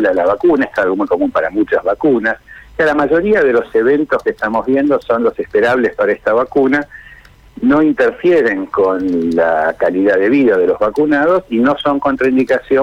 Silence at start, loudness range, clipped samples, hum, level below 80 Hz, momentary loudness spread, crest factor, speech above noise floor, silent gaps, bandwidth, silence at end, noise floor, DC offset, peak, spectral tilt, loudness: 0 s; 2 LU; under 0.1%; none; -46 dBFS; 4 LU; 8 dB; 28 dB; none; 8.8 kHz; 0 s; -41 dBFS; under 0.1%; -4 dBFS; -7 dB/octave; -13 LUFS